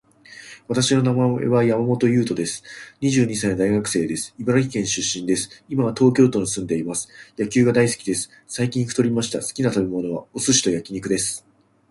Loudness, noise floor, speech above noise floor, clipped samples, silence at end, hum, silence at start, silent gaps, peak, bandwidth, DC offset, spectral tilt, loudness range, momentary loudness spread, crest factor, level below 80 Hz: -21 LUFS; -44 dBFS; 23 dB; under 0.1%; 0.5 s; none; 0.3 s; none; -2 dBFS; 11.5 kHz; under 0.1%; -4.5 dB/octave; 2 LU; 10 LU; 18 dB; -54 dBFS